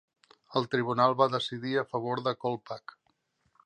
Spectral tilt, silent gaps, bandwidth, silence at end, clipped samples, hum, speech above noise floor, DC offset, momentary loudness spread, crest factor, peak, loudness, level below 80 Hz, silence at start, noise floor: -6.5 dB/octave; none; 9.8 kHz; 0.85 s; under 0.1%; none; 45 dB; under 0.1%; 11 LU; 22 dB; -10 dBFS; -29 LUFS; -74 dBFS; 0.5 s; -74 dBFS